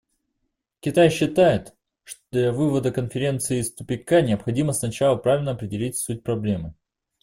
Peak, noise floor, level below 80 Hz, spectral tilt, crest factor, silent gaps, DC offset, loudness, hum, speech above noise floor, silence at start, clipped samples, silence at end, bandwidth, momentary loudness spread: -4 dBFS; -77 dBFS; -52 dBFS; -5.5 dB/octave; 18 dB; none; under 0.1%; -22 LUFS; none; 55 dB; 0.85 s; under 0.1%; 0.5 s; 16 kHz; 10 LU